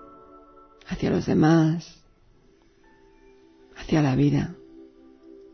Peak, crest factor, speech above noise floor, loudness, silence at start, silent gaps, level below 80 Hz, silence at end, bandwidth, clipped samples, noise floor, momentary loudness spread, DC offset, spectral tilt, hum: -6 dBFS; 20 dB; 37 dB; -23 LUFS; 0.9 s; none; -50 dBFS; 0.7 s; 6.6 kHz; under 0.1%; -58 dBFS; 21 LU; under 0.1%; -7.5 dB/octave; none